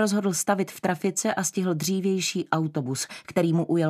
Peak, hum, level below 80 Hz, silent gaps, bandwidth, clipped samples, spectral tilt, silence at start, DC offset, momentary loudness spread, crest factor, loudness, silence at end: -8 dBFS; none; -70 dBFS; none; 15 kHz; under 0.1%; -4.5 dB/octave; 0 s; under 0.1%; 5 LU; 18 dB; -26 LUFS; 0 s